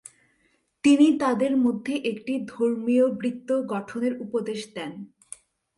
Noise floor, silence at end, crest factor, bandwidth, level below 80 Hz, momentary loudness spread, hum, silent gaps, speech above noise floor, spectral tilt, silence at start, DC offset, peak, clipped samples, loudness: -68 dBFS; 0.7 s; 16 dB; 11.5 kHz; -70 dBFS; 19 LU; none; none; 45 dB; -5.5 dB/octave; 0.85 s; under 0.1%; -8 dBFS; under 0.1%; -24 LUFS